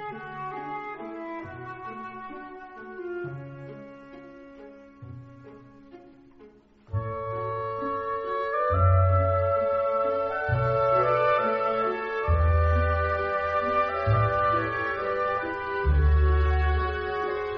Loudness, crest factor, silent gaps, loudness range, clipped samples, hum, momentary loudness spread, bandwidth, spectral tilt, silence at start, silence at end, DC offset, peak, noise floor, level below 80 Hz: -26 LUFS; 16 dB; none; 17 LU; under 0.1%; none; 20 LU; 5.6 kHz; -6 dB/octave; 0 s; 0 s; under 0.1%; -10 dBFS; -53 dBFS; -32 dBFS